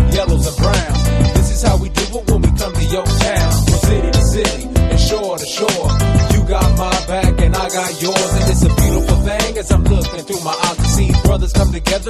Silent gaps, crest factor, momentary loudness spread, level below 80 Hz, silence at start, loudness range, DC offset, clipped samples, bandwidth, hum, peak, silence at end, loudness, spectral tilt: none; 14 dB; 4 LU; -16 dBFS; 0 s; 1 LU; under 0.1%; under 0.1%; 13.5 kHz; none; 0 dBFS; 0 s; -15 LUFS; -5 dB/octave